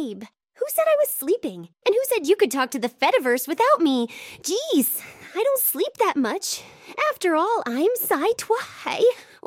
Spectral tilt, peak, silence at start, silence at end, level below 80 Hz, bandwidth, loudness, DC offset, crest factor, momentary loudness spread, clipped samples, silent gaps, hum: -2.5 dB/octave; -6 dBFS; 0 s; 0.25 s; -72 dBFS; 17.5 kHz; -22 LUFS; under 0.1%; 16 dB; 10 LU; under 0.1%; none; none